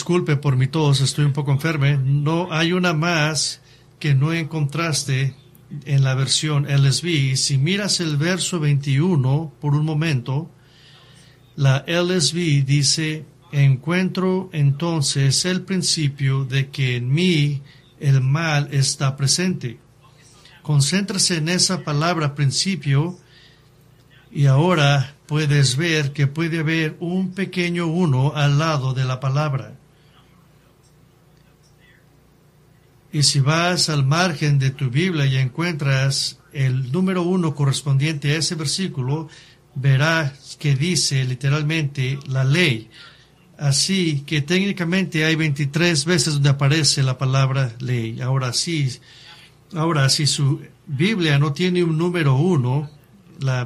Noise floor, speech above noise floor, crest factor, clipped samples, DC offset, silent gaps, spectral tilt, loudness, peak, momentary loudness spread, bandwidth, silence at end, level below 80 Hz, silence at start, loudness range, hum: -53 dBFS; 34 dB; 18 dB; under 0.1%; under 0.1%; none; -4.5 dB/octave; -19 LUFS; -2 dBFS; 7 LU; 13 kHz; 0 s; -54 dBFS; 0 s; 3 LU; none